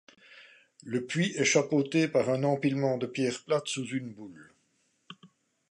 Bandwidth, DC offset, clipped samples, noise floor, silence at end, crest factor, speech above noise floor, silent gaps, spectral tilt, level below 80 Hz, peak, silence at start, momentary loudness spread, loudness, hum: 11 kHz; under 0.1%; under 0.1%; -73 dBFS; 0.45 s; 20 dB; 44 dB; none; -4.5 dB/octave; -78 dBFS; -10 dBFS; 0.3 s; 14 LU; -29 LUFS; none